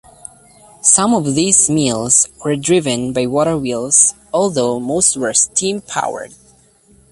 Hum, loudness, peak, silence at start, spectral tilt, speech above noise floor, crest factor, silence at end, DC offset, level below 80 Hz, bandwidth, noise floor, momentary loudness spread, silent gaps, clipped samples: none; -14 LUFS; 0 dBFS; 0.85 s; -3 dB/octave; 35 dB; 16 dB; 0.85 s; under 0.1%; -50 dBFS; 12 kHz; -50 dBFS; 9 LU; none; under 0.1%